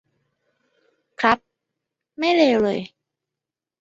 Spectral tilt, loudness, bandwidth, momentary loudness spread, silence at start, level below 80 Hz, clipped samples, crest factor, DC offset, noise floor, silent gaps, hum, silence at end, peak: -5 dB/octave; -20 LUFS; 7.8 kHz; 11 LU; 1.2 s; -62 dBFS; under 0.1%; 22 dB; under 0.1%; -87 dBFS; none; none; 0.95 s; -2 dBFS